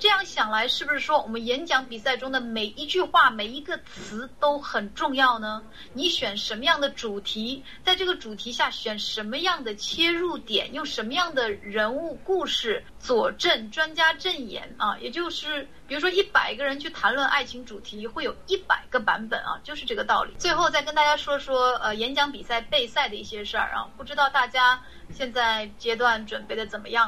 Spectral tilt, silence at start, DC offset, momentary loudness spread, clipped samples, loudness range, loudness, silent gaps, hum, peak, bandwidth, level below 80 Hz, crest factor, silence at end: -2.5 dB/octave; 0 s; 0.5%; 10 LU; under 0.1%; 2 LU; -25 LUFS; none; none; -6 dBFS; 16 kHz; -54 dBFS; 20 dB; 0 s